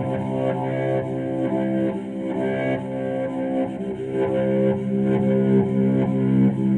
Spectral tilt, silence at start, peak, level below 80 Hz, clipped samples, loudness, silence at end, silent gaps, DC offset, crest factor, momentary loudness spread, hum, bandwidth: -9.5 dB/octave; 0 s; -8 dBFS; -56 dBFS; under 0.1%; -22 LUFS; 0 s; none; under 0.1%; 14 dB; 7 LU; none; 8.4 kHz